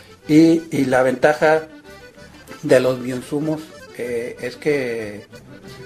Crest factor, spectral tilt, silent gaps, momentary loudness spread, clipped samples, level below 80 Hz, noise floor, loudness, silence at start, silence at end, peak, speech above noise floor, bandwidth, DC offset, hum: 18 dB; -6 dB/octave; none; 19 LU; under 0.1%; -54 dBFS; -42 dBFS; -18 LUFS; 0.1 s; 0 s; 0 dBFS; 24 dB; 14.5 kHz; under 0.1%; none